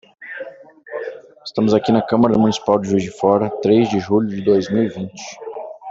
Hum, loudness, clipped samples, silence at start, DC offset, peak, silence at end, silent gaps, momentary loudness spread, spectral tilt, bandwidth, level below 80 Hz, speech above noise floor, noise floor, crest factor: none; -17 LUFS; under 0.1%; 0.2 s; under 0.1%; -2 dBFS; 0 s; none; 17 LU; -6.5 dB/octave; 7.8 kHz; -56 dBFS; 22 dB; -39 dBFS; 16 dB